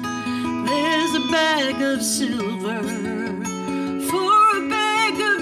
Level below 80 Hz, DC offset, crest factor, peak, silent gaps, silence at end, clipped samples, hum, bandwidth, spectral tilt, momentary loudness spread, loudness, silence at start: -58 dBFS; under 0.1%; 14 dB; -6 dBFS; none; 0 s; under 0.1%; none; 15 kHz; -3 dB/octave; 10 LU; -20 LUFS; 0 s